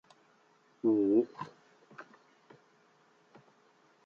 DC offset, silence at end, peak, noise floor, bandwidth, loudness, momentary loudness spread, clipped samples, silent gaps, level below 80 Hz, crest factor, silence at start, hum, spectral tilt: under 0.1%; 2.05 s; -16 dBFS; -67 dBFS; 6.8 kHz; -30 LUFS; 26 LU; under 0.1%; none; -84 dBFS; 20 dB; 0.85 s; none; -8.5 dB/octave